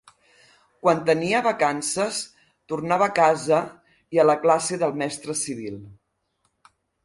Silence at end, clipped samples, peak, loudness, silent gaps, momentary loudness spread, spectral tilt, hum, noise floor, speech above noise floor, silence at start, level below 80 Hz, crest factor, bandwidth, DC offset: 1.1 s; under 0.1%; -4 dBFS; -22 LUFS; none; 14 LU; -4 dB/octave; none; -72 dBFS; 50 dB; 0.85 s; -66 dBFS; 18 dB; 11.5 kHz; under 0.1%